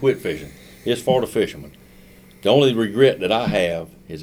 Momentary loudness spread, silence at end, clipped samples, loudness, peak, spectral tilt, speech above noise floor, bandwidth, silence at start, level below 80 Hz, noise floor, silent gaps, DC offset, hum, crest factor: 16 LU; 0 s; under 0.1%; -20 LUFS; -2 dBFS; -5.5 dB/octave; 27 dB; 16.5 kHz; 0 s; -50 dBFS; -46 dBFS; none; under 0.1%; none; 18 dB